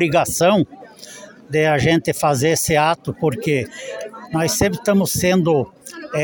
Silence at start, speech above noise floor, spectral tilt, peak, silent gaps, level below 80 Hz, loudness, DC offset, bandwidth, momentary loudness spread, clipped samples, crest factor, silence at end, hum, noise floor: 0 s; 22 dB; -4.5 dB/octave; -2 dBFS; none; -46 dBFS; -18 LUFS; under 0.1%; 17.5 kHz; 16 LU; under 0.1%; 16 dB; 0 s; none; -39 dBFS